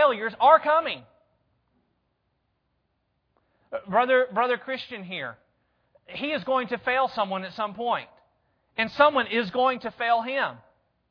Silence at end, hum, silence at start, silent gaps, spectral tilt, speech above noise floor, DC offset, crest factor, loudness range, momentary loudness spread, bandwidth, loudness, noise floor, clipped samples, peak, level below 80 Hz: 0.55 s; none; 0 s; none; -6 dB/octave; 50 dB; under 0.1%; 22 dB; 4 LU; 14 LU; 5.4 kHz; -24 LUFS; -74 dBFS; under 0.1%; -4 dBFS; -68 dBFS